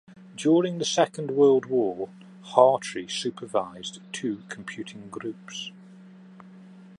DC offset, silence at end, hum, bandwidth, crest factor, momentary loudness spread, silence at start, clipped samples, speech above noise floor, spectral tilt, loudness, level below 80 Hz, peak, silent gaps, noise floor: under 0.1%; 0.15 s; none; 11 kHz; 24 dB; 18 LU; 0.1 s; under 0.1%; 23 dB; -4.5 dB/octave; -25 LUFS; -74 dBFS; -2 dBFS; none; -48 dBFS